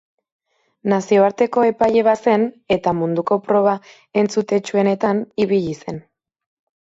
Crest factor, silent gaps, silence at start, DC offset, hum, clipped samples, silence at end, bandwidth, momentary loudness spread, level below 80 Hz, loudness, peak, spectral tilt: 16 dB; none; 0.85 s; under 0.1%; none; under 0.1%; 0.85 s; 8 kHz; 10 LU; -58 dBFS; -18 LUFS; -4 dBFS; -6.5 dB/octave